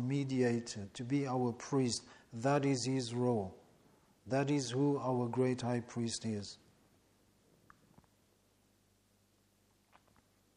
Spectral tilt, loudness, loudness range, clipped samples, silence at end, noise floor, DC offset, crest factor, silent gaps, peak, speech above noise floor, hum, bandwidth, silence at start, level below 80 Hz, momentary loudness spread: -5.5 dB/octave; -36 LUFS; 9 LU; under 0.1%; 4 s; -73 dBFS; under 0.1%; 18 dB; none; -20 dBFS; 37 dB; none; 11 kHz; 0 s; -74 dBFS; 10 LU